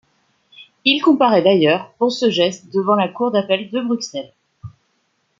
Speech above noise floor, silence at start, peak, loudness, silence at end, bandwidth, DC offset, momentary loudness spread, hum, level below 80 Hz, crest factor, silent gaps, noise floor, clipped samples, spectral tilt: 50 dB; 0.6 s; -2 dBFS; -17 LUFS; 0.7 s; 7.8 kHz; under 0.1%; 9 LU; none; -64 dBFS; 18 dB; none; -66 dBFS; under 0.1%; -5 dB/octave